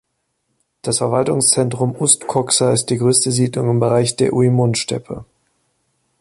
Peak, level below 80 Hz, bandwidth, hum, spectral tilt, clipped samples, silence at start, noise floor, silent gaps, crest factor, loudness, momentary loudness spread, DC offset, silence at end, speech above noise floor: 0 dBFS; -52 dBFS; 11.5 kHz; none; -4.5 dB/octave; under 0.1%; 0.85 s; -70 dBFS; none; 18 dB; -16 LUFS; 8 LU; under 0.1%; 0.95 s; 54 dB